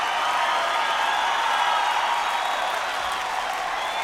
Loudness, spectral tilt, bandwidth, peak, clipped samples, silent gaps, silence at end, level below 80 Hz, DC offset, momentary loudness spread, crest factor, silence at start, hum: -23 LUFS; 0.5 dB/octave; 17 kHz; -10 dBFS; under 0.1%; none; 0 s; -58 dBFS; under 0.1%; 5 LU; 14 dB; 0 s; none